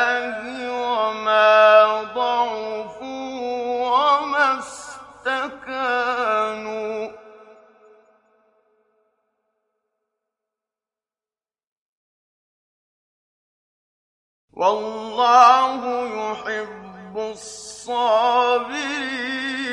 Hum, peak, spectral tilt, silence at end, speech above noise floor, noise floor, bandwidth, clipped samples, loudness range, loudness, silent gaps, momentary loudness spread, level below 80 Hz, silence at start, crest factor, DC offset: none; -2 dBFS; -2.5 dB/octave; 0 s; over 70 dB; under -90 dBFS; 11 kHz; under 0.1%; 11 LU; -20 LUFS; 11.67-14.48 s; 18 LU; -68 dBFS; 0 s; 20 dB; under 0.1%